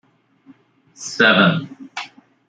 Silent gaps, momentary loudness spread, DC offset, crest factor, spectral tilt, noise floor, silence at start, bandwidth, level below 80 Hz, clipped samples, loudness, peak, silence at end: none; 20 LU; under 0.1%; 20 dB; -4.5 dB/octave; -51 dBFS; 1 s; 9.2 kHz; -64 dBFS; under 0.1%; -15 LUFS; -2 dBFS; 0.4 s